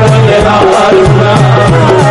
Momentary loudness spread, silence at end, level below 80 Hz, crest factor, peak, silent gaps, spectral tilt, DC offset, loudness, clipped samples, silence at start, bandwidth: 1 LU; 0 s; -24 dBFS; 4 dB; 0 dBFS; none; -6.5 dB/octave; under 0.1%; -5 LUFS; 0.5%; 0 s; 11.5 kHz